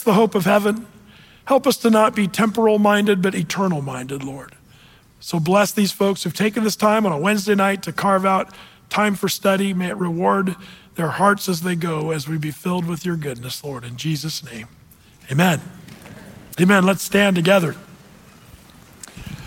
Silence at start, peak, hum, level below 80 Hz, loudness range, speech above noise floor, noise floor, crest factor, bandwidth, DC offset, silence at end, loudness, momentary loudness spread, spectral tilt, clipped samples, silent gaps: 0 s; -4 dBFS; none; -56 dBFS; 6 LU; 30 dB; -49 dBFS; 16 dB; 17 kHz; under 0.1%; 0 s; -19 LUFS; 17 LU; -5 dB/octave; under 0.1%; none